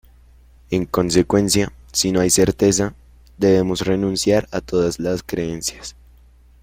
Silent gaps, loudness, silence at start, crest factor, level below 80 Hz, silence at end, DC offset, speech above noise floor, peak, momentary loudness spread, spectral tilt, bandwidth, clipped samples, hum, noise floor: none; -19 LUFS; 0.7 s; 16 dB; -42 dBFS; 0.7 s; under 0.1%; 30 dB; -2 dBFS; 9 LU; -4.5 dB/octave; 16.5 kHz; under 0.1%; none; -49 dBFS